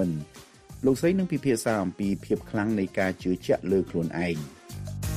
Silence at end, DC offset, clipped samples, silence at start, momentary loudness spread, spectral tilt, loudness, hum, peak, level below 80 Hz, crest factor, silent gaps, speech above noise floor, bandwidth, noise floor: 0 s; under 0.1%; under 0.1%; 0 s; 11 LU; -6.5 dB/octave; -27 LUFS; none; -12 dBFS; -48 dBFS; 16 dB; none; 21 dB; 15.5 kHz; -47 dBFS